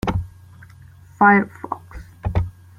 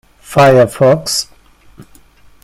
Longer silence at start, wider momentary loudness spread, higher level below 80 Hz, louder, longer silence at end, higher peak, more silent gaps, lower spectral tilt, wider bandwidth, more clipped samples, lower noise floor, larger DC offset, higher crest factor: second, 0.05 s vs 0.3 s; first, 20 LU vs 10 LU; first, -38 dBFS vs -44 dBFS; second, -19 LUFS vs -11 LUFS; second, 0.3 s vs 0.6 s; about the same, -2 dBFS vs 0 dBFS; neither; first, -8 dB/octave vs -5 dB/octave; second, 10.5 kHz vs 16.5 kHz; neither; about the same, -45 dBFS vs -43 dBFS; neither; first, 20 dB vs 14 dB